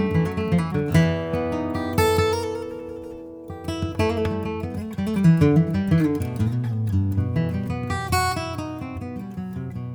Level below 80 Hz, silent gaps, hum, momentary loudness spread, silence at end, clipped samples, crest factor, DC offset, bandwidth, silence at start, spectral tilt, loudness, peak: -42 dBFS; none; none; 13 LU; 0 s; under 0.1%; 18 dB; under 0.1%; over 20 kHz; 0 s; -7 dB/octave; -23 LUFS; -6 dBFS